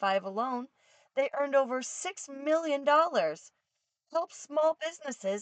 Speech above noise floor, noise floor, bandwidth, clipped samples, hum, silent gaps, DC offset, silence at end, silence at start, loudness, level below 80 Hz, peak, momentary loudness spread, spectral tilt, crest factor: 53 dB; -84 dBFS; 9.2 kHz; under 0.1%; none; none; under 0.1%; 0 s; 0 s; -31 LUFS; under -90 dBFS; -12 dBFS; 12 LU; -3 dB/octave; 18 dB